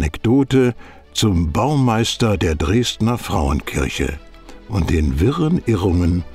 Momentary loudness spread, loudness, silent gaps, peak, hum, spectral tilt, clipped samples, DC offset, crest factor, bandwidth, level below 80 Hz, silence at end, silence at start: 7 LU; -18 LUFS; none; -4 dBFS; none; -6 dB/octave; under 0.1%; under 0.1%; 14 dB; 15.5 kHz; -28 dBFS; 0 s; 0 s